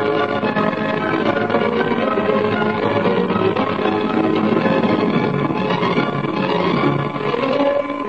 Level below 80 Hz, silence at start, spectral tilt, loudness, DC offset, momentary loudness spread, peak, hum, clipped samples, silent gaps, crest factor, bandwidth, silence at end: -54 dBFS; 0 s; -8 dB/octave; -18 LUFS; 0.4%; 3 LU; -4 dBFS; none; under 0.1%; none; 14 dB; 8 kHz; 0 s